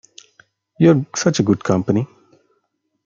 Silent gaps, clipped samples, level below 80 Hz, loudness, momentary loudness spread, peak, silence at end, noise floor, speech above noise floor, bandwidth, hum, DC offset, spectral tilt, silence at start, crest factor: none; under 0.1%; -56 dBFS; -17 LUFS; 7 LU; -2 dBFS; 1 s; -70 dBFS; 54 dB; 7.6 kHz; none; under 0.1%; -6 dB/octave; 0.8 s; 18 dB